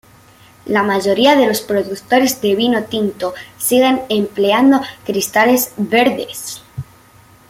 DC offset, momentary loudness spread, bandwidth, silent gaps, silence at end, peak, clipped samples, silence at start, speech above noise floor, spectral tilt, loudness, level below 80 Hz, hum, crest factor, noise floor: under 0.1%; 13 LU; 16.5 kHz; none; 0.65 s; -2 dBFS; under 0.1%; 0.65 s; 31 dB; -3.5 dB/octave; -15 LUFS; -54 dBFS; none; 14 dB; -46 dBFS